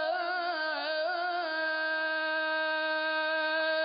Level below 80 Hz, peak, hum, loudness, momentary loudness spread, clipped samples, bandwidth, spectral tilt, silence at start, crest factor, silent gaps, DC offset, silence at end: -86 dBFS; -20 dBFS; none; -30 LUFS; 3 LU; under 0.1%; 5.4 kHz; 4 dB/octave; 0 s; 10 dB; none; under 0.1%; 0 s